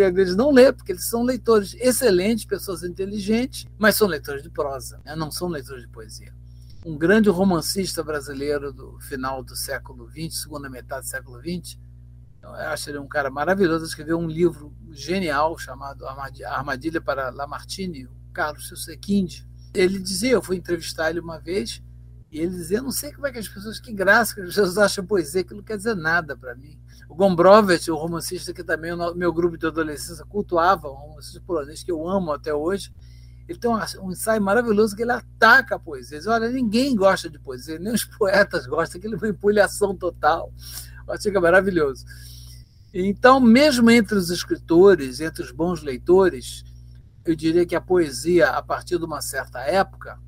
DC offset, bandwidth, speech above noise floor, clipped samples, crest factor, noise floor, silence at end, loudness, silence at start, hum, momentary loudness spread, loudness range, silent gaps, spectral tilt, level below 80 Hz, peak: under 0.1%; 16 kHz; 23 dB; under 0.1%; 22 dB; -45 dBFS; 0.1 s; -21 LUFS; 0 s; 60 Hz at -40 dBFS; 18 LU; 9 LU; none; -4.5 dB/octave; -44 dBFS; 0 dBFS